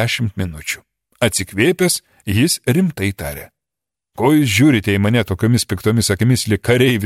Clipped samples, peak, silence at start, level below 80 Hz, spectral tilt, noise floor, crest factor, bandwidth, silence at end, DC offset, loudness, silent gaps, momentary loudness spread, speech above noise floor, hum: under 0.1%; 0 dBFS; 0 s; -44 dBFS; -5 dB/octave; -86 dBFS; 16 dB; 16 kHz; 0 s; under 0.1%; -16 LUFS; none; 11 LU; 70 dB; none